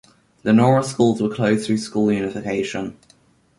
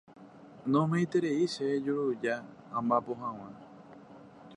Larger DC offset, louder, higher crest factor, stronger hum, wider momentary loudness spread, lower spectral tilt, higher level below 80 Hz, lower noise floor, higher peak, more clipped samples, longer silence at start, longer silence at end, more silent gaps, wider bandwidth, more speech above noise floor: neither; first, -20 LUFS vs -31 LUFS; about the same, 18 dB vs 18 dB; neither; second, 12 LU vs 23 LU; about the same, -6.5 dB/octave vs -7 dB/octave; first, -56 dBFS vs -76 dBFS; first, -56 dBFS vs -52 dBFS; first, -2 dBFS vs -14 dBFS; neither; first, 0.45 s vs 0.1 s; first, 0.65 s vs 0 s; neither; about the same, 11.5 kHz vs 11 kHz; first, 38 dB vs 21 dB